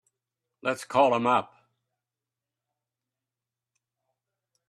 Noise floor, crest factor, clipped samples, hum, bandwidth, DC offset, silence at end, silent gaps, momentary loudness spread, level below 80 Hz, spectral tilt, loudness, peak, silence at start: -89 dBFS; 22 dB; under 0.1%; none; 13 kHz; under 0.1%; 3.25 s; none; 10 LU; -78 dBFS; -5 dB/octave; -25 LUFS; -8 dBFS; 0.65 s